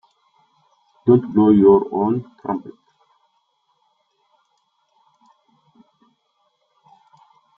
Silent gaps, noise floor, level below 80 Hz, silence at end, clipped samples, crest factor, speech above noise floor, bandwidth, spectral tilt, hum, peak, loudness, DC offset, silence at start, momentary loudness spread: none; -68 dBFS; -60 dBFS; 4.9 s; under 0.1%; 20 dB; 52 dB; 3.7 kHz; -11.5 dB/octave; none; -2 dBFS; -17 LUFS; under 0.1%; 1.05 s; 15 LU